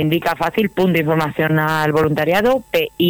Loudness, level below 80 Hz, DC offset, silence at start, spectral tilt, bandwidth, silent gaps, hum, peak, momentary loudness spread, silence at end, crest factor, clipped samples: -17 LUFS; -48 dBFS; under 0.1%; 0 s; -6.5 dB/octave; over 20 kHz; none; none; -6 dBFS; 3 LU; 0 s; 10 dB; under 0.1%